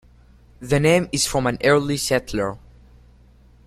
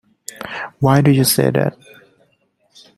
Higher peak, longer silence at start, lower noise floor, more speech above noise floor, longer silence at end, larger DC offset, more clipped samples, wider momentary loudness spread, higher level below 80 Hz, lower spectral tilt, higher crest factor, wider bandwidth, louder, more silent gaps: about the same, -2 dBFS vs -2 dBFS; first, 0.6 s vs 0.4 s; second, -51 dBFS vs -62 dBFS; second, 31 dB vs 47 dB; second, 1.1 s vs 1.25 s; neither; neither; second, 11 LU vs 17 LU; first, -44 dBFS vs -52 dBFS; about the same, -4.5 dB/octave vs -5.5 dB/octave; about the same, 20 dB vs 16 dB; first, 16 kHz vs 14.5 kHz; second, -20 LUFS vs -15 LUFS; neither